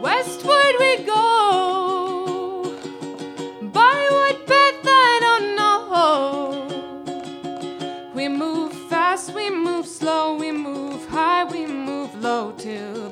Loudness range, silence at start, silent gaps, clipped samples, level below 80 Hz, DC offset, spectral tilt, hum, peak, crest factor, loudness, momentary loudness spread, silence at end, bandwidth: 8 LU; 0 s; none; under 0.1%; -64 dBFS; under 0.1%; -3 dB/octave; none; -2 dBFS; 18 dB; -19 LUFS; 16 LU; 0 s; 15 kHz